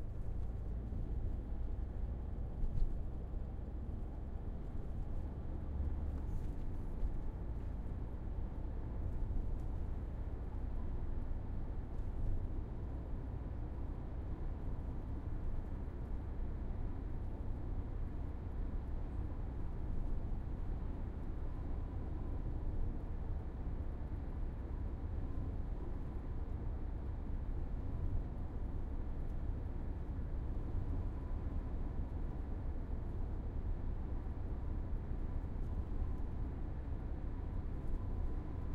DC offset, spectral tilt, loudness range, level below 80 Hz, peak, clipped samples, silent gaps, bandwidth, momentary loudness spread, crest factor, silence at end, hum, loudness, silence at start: under 0.1%; -10 dB/octave; 1 LU; -40 dBFS; -24 dBFS; under 0.1%; none; 4 kHz; 3 LU; 16 dB; 0 s; none; -45 LUFS; 0 s